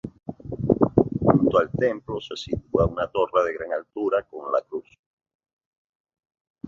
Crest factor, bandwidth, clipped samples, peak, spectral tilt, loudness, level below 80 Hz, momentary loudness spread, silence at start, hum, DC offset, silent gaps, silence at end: 22 dB; 7.4 kHz; under 0.1%; -2 dBFS; -8 dB/octave; -24 LUFS; -46 dBFS; 14 LU; 0.05 s; none; under 0.1%; 4.99-5.17 s, 5.35-5.39 s, 5.53-5.57 s, 5.65-6.05 s, 6.41-6.55 s; 0 s